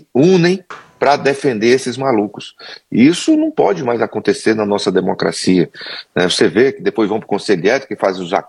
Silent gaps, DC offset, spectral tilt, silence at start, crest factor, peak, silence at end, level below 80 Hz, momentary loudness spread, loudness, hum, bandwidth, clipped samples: none; under 0.1%; -5 dB/octave; 0.15 s; 14 dB; 0 dBFS; 0.05 s; -62 dBFS; 9 LU; -15 LUFS; none; 11.5 kHz; under 0.1%